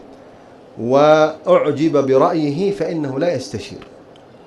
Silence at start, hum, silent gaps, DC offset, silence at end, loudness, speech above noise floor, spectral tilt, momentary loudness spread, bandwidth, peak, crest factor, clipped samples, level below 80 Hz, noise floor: 0.1 s; none; none; under 0.1%; 0.65 s; -16 LUFS; 27 dB; -6.5 dB/octave; 16 LU; 11.5 kHz; 0 dBFS; 18 dB; under 0.1%; -58 dBFS; -43 dBFS